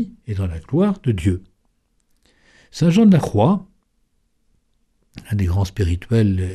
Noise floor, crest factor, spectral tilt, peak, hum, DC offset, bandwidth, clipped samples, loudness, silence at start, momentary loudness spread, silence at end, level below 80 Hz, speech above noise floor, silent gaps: -65 dBFS; 16 dB; -8 dB/octave; -4 dBFS; none; under 0.1%; 13 kHz; under 0.1%; -19 LUFS; 0 s; 12 LU; 0 s; -38 dBFS; 47 dB; none